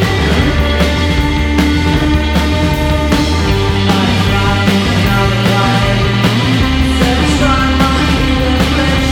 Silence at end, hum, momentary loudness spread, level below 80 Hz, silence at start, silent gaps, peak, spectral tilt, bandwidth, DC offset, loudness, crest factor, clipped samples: 0 s; none; 2 LU; -18 dBFS; 0 s; none; 0 dBFS; -5.5 dB/octave; 17 kHz; under 0.1%; -12 LUFS; 12 dB; under 0.1%